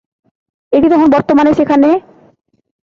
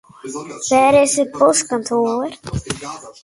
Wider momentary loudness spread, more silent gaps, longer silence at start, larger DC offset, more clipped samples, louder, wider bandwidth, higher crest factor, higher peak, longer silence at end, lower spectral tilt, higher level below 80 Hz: second, 5 LU vs 17 LU; neither; first, 0.7 s vs 0.25 s; neither; neither; first, -10 LUFS vs -16 LUFS; second, 7 kHz vs 11.5 kHz; second, 10 dB vs 16 dB; about the same, -2 dBFS vs 0 dBFS; first, 0.9 s vs 0.1 s; first, -7.5 dB/octave vs -3.5 dB/octave; about the same, -46 dBFS vs -44 dBFS